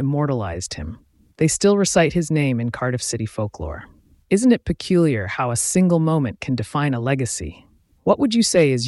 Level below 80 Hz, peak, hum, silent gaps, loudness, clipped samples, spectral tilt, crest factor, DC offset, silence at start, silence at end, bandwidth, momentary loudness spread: -44 dBFS; -4 dBFS; none; none; -20 LUFS; under 0.1%; -5 dB/octave; 16 dB; under 0.1%; 0 s; 0 s; 12 kHz; 12 LU